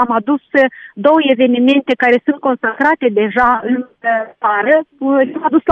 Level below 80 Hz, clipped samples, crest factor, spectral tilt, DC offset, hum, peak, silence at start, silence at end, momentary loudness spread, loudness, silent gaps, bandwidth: -52 dBFS; under 0.1%; 12 dB; -6.5 dB/octave; under 0.1%; none; 0 dBFS; 0 s; 0 s; 5 LU; -14 LUFS; none; 6.2 kHz